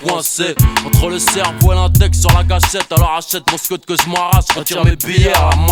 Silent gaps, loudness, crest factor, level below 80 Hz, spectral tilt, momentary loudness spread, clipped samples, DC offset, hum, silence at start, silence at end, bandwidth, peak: none; -13 LUFS; 12 dB; -20 dBFS; -4 dB/octave; 5 LU; under 0.1%; under 0.1%; none; 0 s; 0 s; 19.5 kHz; 0 dBFS